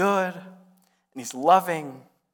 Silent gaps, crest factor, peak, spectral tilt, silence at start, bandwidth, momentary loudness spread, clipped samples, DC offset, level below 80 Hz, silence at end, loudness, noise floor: none; 20 dB; -6 dBFS; -4.5 dB/octave; 0 s; 19 kHz; 22 LU; under 0.1%; under 0.1%; -76 dBFS; 0.35 s; -23 LUFS; -62 dBFS